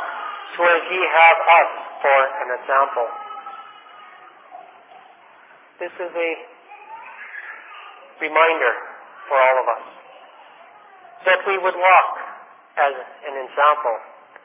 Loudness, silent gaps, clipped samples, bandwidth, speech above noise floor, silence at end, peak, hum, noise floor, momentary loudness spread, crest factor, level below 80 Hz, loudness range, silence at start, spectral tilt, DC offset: -18 LUFS; none; under 0.1%; 3.9 kHz; 31 dB; 0.35 s; -2 dBFS; none; -49 dBFS; 22 LU; 20 dB; under -90 dBFS; 15 LU; 0 s; -4.5 dB/octave; under 0.1%